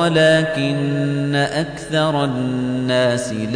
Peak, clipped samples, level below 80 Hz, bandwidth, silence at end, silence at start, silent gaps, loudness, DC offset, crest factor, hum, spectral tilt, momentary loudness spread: -4 dBFS; under 0.1%; -50 dBFS; 10 kHz; 0 s; 0 s; none; -18 LUFS; under 0.1%; 12 dB; none; -5.5 dB/octave; 7 LU